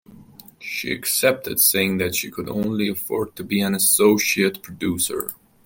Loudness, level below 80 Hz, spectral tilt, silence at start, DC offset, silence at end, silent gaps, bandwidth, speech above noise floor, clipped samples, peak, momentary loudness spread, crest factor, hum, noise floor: -20 LUFS; -58 dBFS; -3 dB/octave; 0.1 s; under 0.1%; 0.3 s; none; 17 kHz; 24 dB; under 0.1%; -4 dBFS; 12 LU; 18 dB; none; -46 dBFS